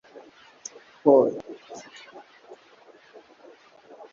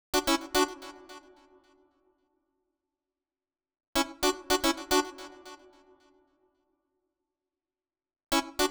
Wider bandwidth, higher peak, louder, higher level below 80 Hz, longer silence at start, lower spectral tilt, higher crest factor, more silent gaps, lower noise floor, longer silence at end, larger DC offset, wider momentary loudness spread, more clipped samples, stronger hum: second, 7.4 kHz vs over 20 kHz; first, -4 dBFS vs -12 dBFS; first, -21 LUFS vs -29 LUFS; second, -76 dBFS vs -54 dBFS; first, 1.05 s vs 0.15 s; first, -5.5 dB/octave vs -1.5 dB/octave; about the same, 24 dB vs 22 dB; second, none vs 3.87-3.93 s; second, -54 dBFS vs under -90 dBFS; first, 2.35 s vs 0 s; neither; first, 26 LU vs 22 LU; neither; neither